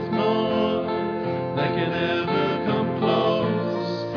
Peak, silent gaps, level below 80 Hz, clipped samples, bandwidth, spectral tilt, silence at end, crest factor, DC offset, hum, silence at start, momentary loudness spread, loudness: -10 dBFS; none; -60 dBFS; under 0.1%; 5.4 kHz; -8 dB/octave; 0 s; 14 dB; under 0.1%; none; 0 s; 5 LU; -23 LUFS